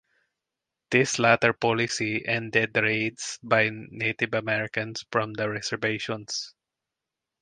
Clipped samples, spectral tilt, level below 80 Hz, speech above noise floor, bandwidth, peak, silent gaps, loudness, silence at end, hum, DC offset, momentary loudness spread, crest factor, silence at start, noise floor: under 0.1%; -4 dB/octave; -66 dBFS; 61 dB; 10 kHz; -2 dBFS; none; -25 LUFS; 0.9 s; none; under 0.1%; 10 LU; 24 dB; 0.9 s; -87 dBFS